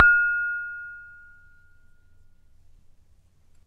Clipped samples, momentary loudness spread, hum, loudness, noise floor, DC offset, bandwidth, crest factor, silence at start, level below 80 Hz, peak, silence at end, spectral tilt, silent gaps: under 0.1%; 27 LU; none; -23 LUFS; -57 dBFS; under 0.1%; 5 kHz; 28 dB; 0 s; -54 dBFS; 0 dBFS; 2.6 s; -4 dB/octave; none